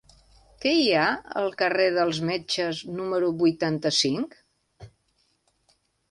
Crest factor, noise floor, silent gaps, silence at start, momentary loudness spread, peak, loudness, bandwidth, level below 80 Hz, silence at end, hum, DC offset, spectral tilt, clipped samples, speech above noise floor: 18 dB; -70 dBFS; none; 0.6 s; 8 LU; -8 dBFS; -24 LUFS; 11.5 kHz; -62 dBFS; 1.25 s; none; under 0.1%; -4 dB/octave; under 0.1%; 45 dB